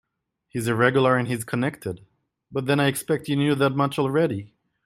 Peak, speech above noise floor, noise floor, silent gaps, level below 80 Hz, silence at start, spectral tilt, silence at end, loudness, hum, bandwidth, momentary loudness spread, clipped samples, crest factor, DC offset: -6 dBFS; 52 dB; -75 dBFS; none; -62 dBFS; 0.55 s; -6 dB/octave; 0.4 s; -23 LUFS; none; 15.5 kHz; 14 LU; under 0.1%; 18 dB; under 0.1%